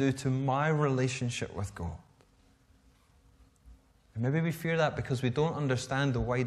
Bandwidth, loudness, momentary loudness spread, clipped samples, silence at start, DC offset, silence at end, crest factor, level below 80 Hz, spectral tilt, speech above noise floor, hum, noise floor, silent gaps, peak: 14 kHz; -31 LUFS; 10 LU; under 0.1%; 0 s; under 0.1%; 0 s; 18 dB; -52 dBFS; -6 dB/octave; 34 dB; none; -64 dBFS; none; -14 dBFS